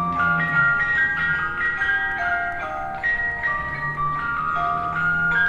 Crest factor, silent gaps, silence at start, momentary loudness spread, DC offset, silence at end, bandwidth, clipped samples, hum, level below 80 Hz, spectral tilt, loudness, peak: 14 dB; none; 0 s; 6 LU; under 0.1%; 0 s; 11 kHz; under 0.1%; none; -44 dBFS; -6 dB/octave; -21 LUFS; -8 dBFS